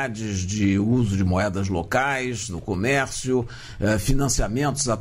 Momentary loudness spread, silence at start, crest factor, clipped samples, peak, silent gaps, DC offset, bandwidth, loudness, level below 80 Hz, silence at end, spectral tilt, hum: 6 LU; 0 s; 14 dB; under 0.1%; -8 dBFS; none; under 0.1%; 16 kHz; -23 LUFS; -34 dBFS; 0 s; -5 dB/octave; none